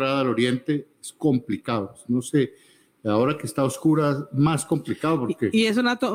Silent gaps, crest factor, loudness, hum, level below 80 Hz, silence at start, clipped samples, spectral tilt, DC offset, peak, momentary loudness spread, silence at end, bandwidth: none; 14 dB; -24 LUFS; none; -62 dBFS; 0 s; under 0.1%; -6 dB/octave; under 0.1%; -10 dBFS; 7 LU; 0 s; 16 kHz